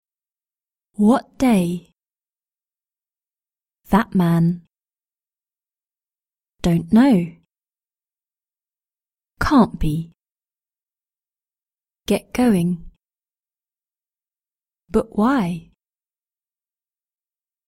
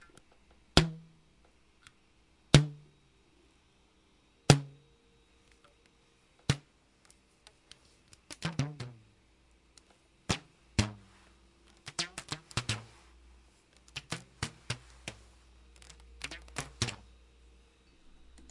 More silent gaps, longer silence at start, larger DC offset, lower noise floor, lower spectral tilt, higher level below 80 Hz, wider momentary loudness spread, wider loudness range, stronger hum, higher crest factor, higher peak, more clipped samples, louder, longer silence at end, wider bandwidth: neither; first, 1 s vs 0.75 s; neither; first, under -90 dBFS vs -67 dBFS; first, -7 dB/octave vs -4.5 dB/octave; first, -42 dBFS vs -52 dBFS; second, 15 LU vs 25 LU; second, 4 LU vs 12 LU; neither; second, 20 dB vs 36 dB; about the same, -2 dBFS vs 0 dBFS; neither; first, -19 LUFS vs -33 LUFS; first, 2.1 s vs 1.55 s; first, 16.5 kHz vs 11.5 kHz